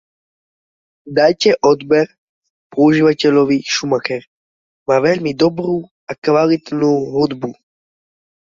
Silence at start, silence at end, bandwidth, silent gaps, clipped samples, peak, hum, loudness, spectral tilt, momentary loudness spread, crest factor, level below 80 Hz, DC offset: 1.05 s; 1.05 s; 7.6 kHz; 2.18-2.42 s, 2.50-2.70 s, 4.27-4.86 s, 5.91-6.07 s, 6.18-6.22 s; under 0.1%; -2 dBFS; none; -15 LUFS; -5.5 dB/octave; 11 LU; 14 dB; -58 dBFS; under 0.1%